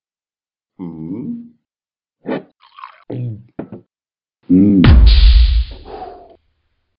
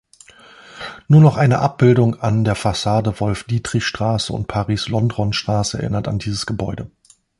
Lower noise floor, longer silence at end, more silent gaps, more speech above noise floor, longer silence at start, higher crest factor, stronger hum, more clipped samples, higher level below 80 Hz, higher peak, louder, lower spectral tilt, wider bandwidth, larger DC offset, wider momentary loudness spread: first, under -90 dBFS vs -46 dBFS; first, 0.9 s vs 0.5 s; neither; first, over 76 dB vs 29 dB; about the same, 0.8 s vs 0.7 s; about the same, 14 dB vs 16 dB; neither; neither; first, -16 dBFS vs -42 dBFS; about the same, 0 dBFS vs -2 dBFS; first, -13 LUFS vs -18 LUFS; first, -10.5 dB/octave vs -6 dB/octave; second, 5.4 kHz vs 11.5 kHz; neither; first, 23 LU vs 12 LU